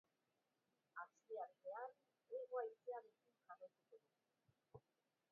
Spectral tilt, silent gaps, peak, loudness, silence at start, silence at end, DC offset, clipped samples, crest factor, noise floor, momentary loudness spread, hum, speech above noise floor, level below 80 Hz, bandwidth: -3.5 dB/octave; none; -36 dBFS; -54 LUFS; 0.95 s; 0.55 s; under 0.1%; under 0.1%; 22 dB; -90 dBFS; 19 LU; none; 36 dB; under -90 dBFS; 4.6 kHz